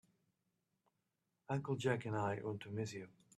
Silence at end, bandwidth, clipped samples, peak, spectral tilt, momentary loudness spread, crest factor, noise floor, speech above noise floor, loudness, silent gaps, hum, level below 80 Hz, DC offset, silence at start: 0.3 s; 12.5 kHz; under 0.1%; -22 dBFS; -6.5 dB/octave; 7 LU; 22 dB; -87 dBFS; 46 dB; -41 LUFS; none; none; -80 dBFS; under 0.1%; 1.5 s